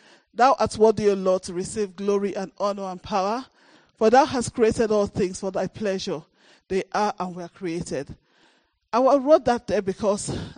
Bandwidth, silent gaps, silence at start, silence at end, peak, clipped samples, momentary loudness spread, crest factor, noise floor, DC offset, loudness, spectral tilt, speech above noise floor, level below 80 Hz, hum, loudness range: 10 kHz; none; 0.35 s; 0.05 s; -4 dBFS; under 0.1%; 13 LU; 18 dB; -63 dBFS; under 0.1%; -23 LUFS; -5 dB/octave; 40 dB; -52 dBFS; none; 5 LU